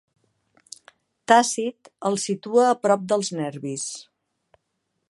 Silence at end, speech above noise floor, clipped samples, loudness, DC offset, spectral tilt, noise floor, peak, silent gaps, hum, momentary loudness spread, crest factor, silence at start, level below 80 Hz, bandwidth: 1.05 s; 54 dB; under 0.1%; -22 LUFS; under 0.1%; -3.5 dB/octave; -76 dBFS; -2 dBFS; none; none; 24 LU; 24 dB; 1.3 s; -78 dBFS; 11.5 kHz